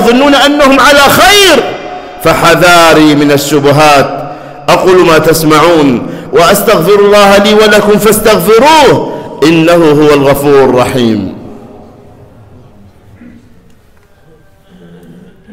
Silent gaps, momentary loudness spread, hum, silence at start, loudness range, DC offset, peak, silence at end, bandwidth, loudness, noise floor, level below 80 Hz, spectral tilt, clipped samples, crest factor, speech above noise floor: none; 10 LU; none; 0 s; 6 LU; under 0.1%; 0 dBFS; 3.75 s; 16.5 kHz; -5 LUFS; -41 dBFS; -32 dBFS; -4 dB/octave; 0.3%; 6 dB; 36 dB